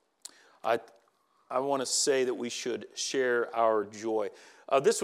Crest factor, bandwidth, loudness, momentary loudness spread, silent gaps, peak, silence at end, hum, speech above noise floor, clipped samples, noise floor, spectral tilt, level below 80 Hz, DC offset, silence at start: 18 dB; 15 kHz; -30 LUFS; 11 LU; none; -12 dBFS; 0 s; none; 40 dB; under 0.1%; -69 dBFS; -2 dB/octave; under -90 dBFS; under 0.1%; 0.65 s